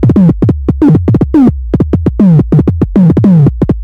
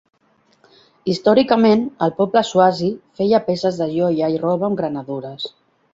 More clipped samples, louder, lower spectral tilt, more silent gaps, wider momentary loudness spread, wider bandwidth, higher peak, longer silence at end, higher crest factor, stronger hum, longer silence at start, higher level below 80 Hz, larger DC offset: neither; first, -8 LUFS vs -18 LUFS; first, -11.5 dB/octave vs -6.5 dB/octave; neither; second, 5 LU vs 13 LU; second, 4.8 kHz vs 7.8 kHz; about the same, 0 dBFS vs -2 dBFS; second, 0 s vs 0.45 s; second, 6 dB vs 16 dB; neither; second, 0 s vs 1.05 s; first, -20 dBFS vs -60 dBFS; neither